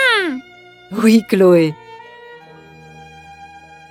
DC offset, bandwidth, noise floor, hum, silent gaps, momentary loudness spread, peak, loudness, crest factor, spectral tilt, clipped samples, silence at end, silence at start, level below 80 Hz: under 0.1%; 16 kHz; -43 dBFS; none; none; 26 LU; 0 dBFS; -14 LUFS; 18 dB; -5.5 dB/octave; under 0.1%; 0.45 s; 0 s; -60 dBFS